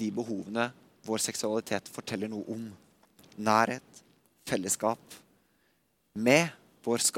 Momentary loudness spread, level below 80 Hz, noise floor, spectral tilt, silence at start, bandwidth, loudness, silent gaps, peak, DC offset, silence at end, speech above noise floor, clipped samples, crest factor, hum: 16 LU; -74 dBFS; -72 dBFS; -3.5 dB/octave; 0 s; 17 kHz; -30 LUFS; none; -8 dBFS; under 0.1%; 0 s; 42 dB; under 0.1%; 24 dB; none